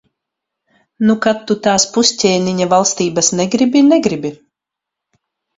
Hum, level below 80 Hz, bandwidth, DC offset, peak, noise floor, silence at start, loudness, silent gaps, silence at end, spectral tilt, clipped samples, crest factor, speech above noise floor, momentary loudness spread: none; -54 dBFS; 8 kHz; under 0.1%; 0 dBFS; -83 dBFS; 1 s; -13 LUFS; none; 1.25 s; -3.5 dB/octave; under 0.1%; 16 dB; 69 dB; 6 LU